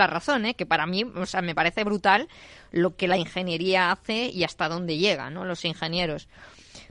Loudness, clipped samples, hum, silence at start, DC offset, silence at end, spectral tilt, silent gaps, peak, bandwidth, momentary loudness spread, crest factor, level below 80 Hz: -25 LUFS; under 0.1%; none; 0 s; under 0.1%; 0.05 s; -5 dB/octave; none; -6 dBFS; 11 kHz; 7 LU; 20 dB; -54 dBFS